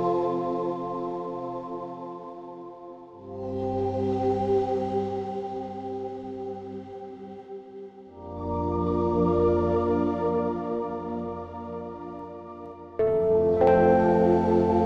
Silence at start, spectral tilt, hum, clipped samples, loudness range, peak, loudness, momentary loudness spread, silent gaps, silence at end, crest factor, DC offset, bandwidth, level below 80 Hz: 0 s; -9.5 dB/octave; none; under 0.1%; 10 LU; -10 dBFS; -26 LUFS; 20 LU; none; 0 s; 18 dB; under 0.1%; 7.2 kHz; -50 dBFS